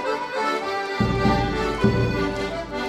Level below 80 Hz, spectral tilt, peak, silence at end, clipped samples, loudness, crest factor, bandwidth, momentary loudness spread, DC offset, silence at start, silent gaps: -36 dBFS; -6.5 dB/octave; -6 dBFS; 0 s; under 0.1%; -23 LUFS; 18 dB; 14 kHz; 5 LU; under 0.1%; 0 s; none